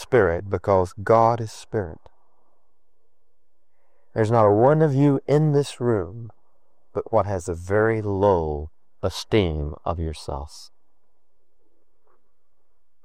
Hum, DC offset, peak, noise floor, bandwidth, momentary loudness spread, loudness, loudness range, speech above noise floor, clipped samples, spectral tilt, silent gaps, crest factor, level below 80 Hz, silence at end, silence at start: none; 0.5%; -4 dBFS; -75 dBFS; 13 kHz; 15 LU; -22 LUFS; 8 LU; 54 dB; under 0.1%; -7 dB/octave; none; 18 dB; -46 dBFS; 2.4 s; 0 s